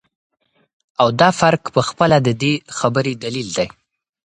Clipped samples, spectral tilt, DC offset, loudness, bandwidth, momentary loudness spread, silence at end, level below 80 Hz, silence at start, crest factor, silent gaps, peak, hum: under 0.1%; -5 dB/octave; under 0.1%; -17 LUFS; 10.5 kHz; 9 LU; 0.55 s; -54 dBFS; 1 s; 18 dB; none; 0 dBFS; none